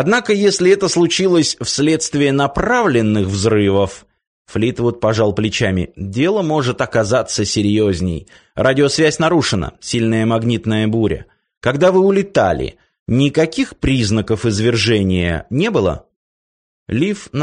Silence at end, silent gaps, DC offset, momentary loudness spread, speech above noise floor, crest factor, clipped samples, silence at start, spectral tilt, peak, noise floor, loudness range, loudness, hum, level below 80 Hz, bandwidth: 0 s; 4.27-4.45 s, 11.57-11.61 s, 12.99-13.06 s, 16.16-16.86 s; under 0.1%; 8 LU; over 75 dB; 14 dB; under 0.1%; 0 s; -5 dB/octave; -2 dBFS; under -90 dBFS; 3 LU; -16 LUFS; none; -38 dBFS; 10 kHz